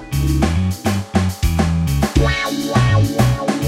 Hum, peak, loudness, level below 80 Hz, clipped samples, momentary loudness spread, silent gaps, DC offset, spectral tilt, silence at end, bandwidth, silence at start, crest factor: none; 0 dBFS; -17 LUFS; -24 dBFS; under 0.1%; 4 LU; none; under 0.1%; -6 dB/octave; 0 s; 16.5 kHz; 0 s; 16 dB